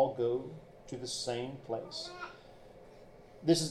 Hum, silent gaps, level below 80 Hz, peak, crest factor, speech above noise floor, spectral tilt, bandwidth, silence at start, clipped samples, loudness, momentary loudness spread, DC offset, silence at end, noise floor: none; none; -64 dBFS; -14 dBFS; 22 dB; 20 dB; -4.5 dB/octave; 13.5 kHz; 0 s; under 0.1%; -37 LUFS; 25 LU; under 0.1%; 0 s; -55 dBFS